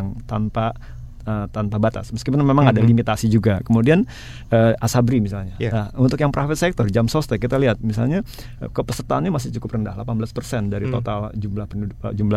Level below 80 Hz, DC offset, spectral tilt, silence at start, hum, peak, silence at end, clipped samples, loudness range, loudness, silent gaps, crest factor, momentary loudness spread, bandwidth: -38 dBFS; under 0.1%; -7 dB/octave; 0 s; none; 0 dBFS; 0 s; under 0.1%; 7 LU; -20 LUFS; none; 20 dB; 11 LU; 15 kHz